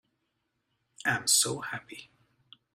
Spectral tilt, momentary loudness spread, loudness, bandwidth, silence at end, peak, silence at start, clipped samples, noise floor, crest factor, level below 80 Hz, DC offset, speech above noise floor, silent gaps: -1 dB/octave; 22 LU; -27 LUFS; 16 kHz; 0.7 s; -10 dBFS; 1.05 s; under 0.1%; -80 dBFS; 24 dB; -72 dBFS; under 0.1%; 50 dB; none